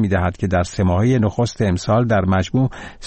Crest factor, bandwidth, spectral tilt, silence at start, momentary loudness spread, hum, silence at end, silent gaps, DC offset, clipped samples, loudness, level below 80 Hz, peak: 10 dB; 8.8 kHz; -7 dB/octave; 0 s; 4 LU; none; 0 s; none; under 0.1%; under 0.1%; -18 LUFS; -38 dBFS; -6 dBFS